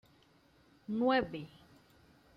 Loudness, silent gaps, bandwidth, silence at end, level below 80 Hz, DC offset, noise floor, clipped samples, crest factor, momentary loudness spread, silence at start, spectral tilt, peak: -34 LUFS; none; 6.4 kHz; 0.9 s; -66 dBFS; under 0.1%; -67 dBFS; under 0.1%; 20 dB; 22 LU; 0.9 s; -7 dB/octave; -18 dBFS